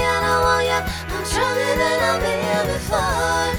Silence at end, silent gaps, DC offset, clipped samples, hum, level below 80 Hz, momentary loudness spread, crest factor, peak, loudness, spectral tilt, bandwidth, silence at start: 0 s; none; under 0.1%; under 0.1%; none; -34 dBFS; 5 LU; 14 dB; -6 dBFS; -20 LUFS; -3.5 dB/octave; over 20 kHz; 0 s